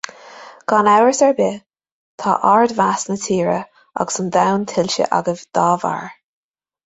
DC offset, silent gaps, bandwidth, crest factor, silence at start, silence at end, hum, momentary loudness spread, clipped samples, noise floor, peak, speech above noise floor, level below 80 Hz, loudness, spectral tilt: under 0.1%; 1.92-2.18 s; 8.2 kHz; 16 dB; 0.25 s; 0.75 s; none; 13 LU; under 0.1%; -40 dBFS; -2 dBFS; 23 dB; -60 dBFS; -17 LUFS; -4.5 dB/octave